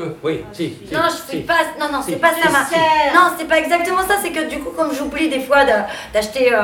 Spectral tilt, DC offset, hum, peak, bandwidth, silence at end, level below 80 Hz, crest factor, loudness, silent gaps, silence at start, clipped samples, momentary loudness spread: -3.5 dB/octave; under 0.1%; none; 0 dBFS; 19 kHz; 0 s; -46 dBFS; 16 dB; -17 LUFS; none; 0 s; under 0.1%; 10 LU